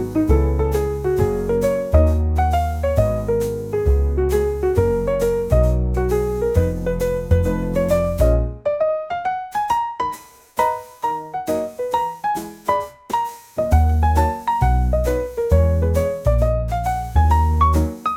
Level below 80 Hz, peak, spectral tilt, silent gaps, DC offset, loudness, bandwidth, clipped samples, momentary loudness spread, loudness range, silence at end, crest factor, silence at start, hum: -24 dBFS; -2 dBFS; -7.5 dB/octave; none; 0.1%; -20 LUFS; 16.5 kHz; under 0.1%; 7 LU; 5 LU; 0 s; 16 dB; 0 s; none